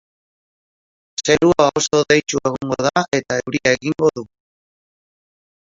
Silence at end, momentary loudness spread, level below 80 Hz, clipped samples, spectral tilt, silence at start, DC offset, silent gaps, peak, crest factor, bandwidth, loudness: 1.4 s; 8 LU; -52 dBFS; under 0.1%; -4 dB/octave; 1.2 s; under 0.1%; none; 0 dBFS; 20 dB; 7.8 kHz; -17 LUFS